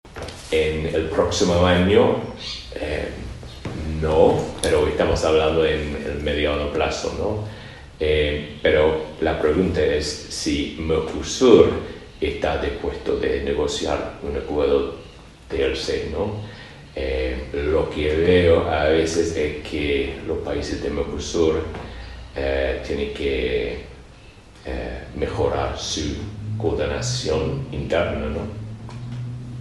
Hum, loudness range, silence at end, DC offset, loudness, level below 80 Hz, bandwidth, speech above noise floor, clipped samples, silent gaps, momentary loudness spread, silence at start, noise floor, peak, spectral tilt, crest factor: none; 6 LU; 0 s; under 0.1%; -22 LUFS; -36 dBFS; 12 kHz; 24 dB; under 0.1%; none; 15 LU; 0.05 s; -45 dBFS; 0 dBFS; -5 dB/octave; 22 dB